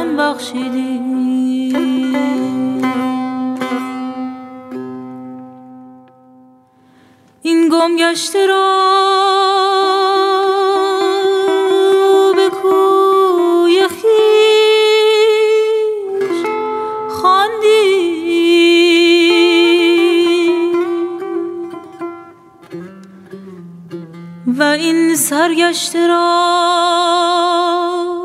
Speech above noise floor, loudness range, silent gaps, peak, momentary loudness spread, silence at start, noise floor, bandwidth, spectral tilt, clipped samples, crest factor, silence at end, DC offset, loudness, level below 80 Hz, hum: 35 dB; 12 LU; none; 0 dBFS; 18 LU; 0 s; -48 dBFS; 15.5 kHz; -3 dB/octave; under 0.1%; 14 dB; 0 s; under 0.1%; -13 LUFS; -68 dBFS; none